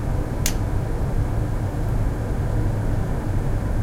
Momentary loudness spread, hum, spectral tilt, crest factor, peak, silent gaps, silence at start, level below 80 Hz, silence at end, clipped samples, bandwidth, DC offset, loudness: 2 LU; none; -6 dB/octave; 18 dB; -4 dBFS; none; 0 s; -24 dBFS; 0 s; under 0.1%; 16.5 kHz; under 0.1%; -25 LUFS